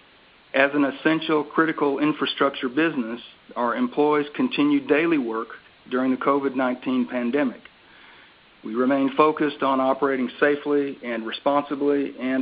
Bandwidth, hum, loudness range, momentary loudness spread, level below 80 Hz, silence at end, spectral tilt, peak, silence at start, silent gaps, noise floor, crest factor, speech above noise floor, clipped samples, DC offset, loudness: 5 kHz; none; 3 LU; 9 LU; -68 dBFS; 0 s; -3 dB/octave; -2 dBFS; 0.55 s; none; -54 dBFS; 20 dB; 31 dB; under 0.1%; under 0.1%; -23 LUFS